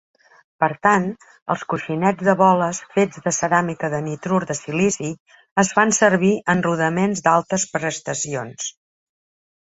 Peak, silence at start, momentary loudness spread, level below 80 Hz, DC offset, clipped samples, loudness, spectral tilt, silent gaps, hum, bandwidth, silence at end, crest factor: -2 dBFS; 0.6 s; 11 LU; -60 dBFS; under 0.1%; under 0.1%; -20 LUFS; -4.5 dB/octave; 1.42-1.46 s, 5.20-5.26 s, 5.51-5.56 s; none; 8.2 kHz; 1.05 s; 18 dB